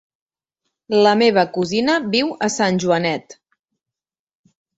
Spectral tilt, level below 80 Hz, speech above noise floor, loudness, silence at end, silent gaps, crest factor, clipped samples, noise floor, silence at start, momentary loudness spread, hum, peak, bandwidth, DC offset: -4.5 dB/octave; -62 dBFS; 71 dB; -17 LUFS; 1.45 s; none; 18 dB; under 0.1%; -88 dBFS; 0.9 s; 7 LU; none; -2 dBFS; 8.2 kHz; under 0.1%